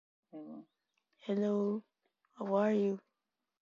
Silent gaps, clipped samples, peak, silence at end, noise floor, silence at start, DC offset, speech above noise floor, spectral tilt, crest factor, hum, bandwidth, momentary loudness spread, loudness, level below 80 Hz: none; under 0.1%; -20 dBFS; 0.6 s; -89 dBFS; 0.35 s; under 0.1%; 55 dB; -7 dB/octave; 18 dB; none; 7.2 kHz; 20 LU; -35 LUFS; -88 dBFS